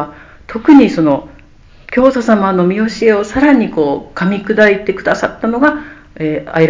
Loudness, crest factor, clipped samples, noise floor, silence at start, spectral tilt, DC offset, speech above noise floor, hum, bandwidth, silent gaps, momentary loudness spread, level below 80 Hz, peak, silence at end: -12 LUFS; 12 dB; 0.5%; -40 dBFS; 0 s; -7 dB/octave; under 0.1%; 29 dB; none; 7.6 kHz; none; 11 LU; -42 dBFS; 0 dBFS; 0 s